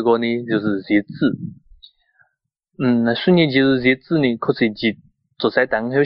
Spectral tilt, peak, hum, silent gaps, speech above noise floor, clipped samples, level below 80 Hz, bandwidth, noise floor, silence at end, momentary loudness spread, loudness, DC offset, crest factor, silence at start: -4.5 dB/octave; -4 dBFS; none; none; 54 dB; under 0.1%; -56 dBFS; 5.6 kHz; -72 dBFS; 0 s; 8 LU; -18 LUFS; under 0.1%; 16 dB; 0 s